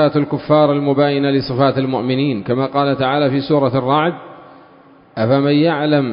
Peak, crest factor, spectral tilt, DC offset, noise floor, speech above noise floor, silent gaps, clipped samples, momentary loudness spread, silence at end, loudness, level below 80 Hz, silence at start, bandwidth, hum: 0 dBFS; 16 dB; -12 dB/octave; under 0.1%; -45 dBFS; 31 dB; none; under 0.1%; 5 LU; 0 s; -16 LUFS; -52 dBFS; 0 s; 5.4 kHz; none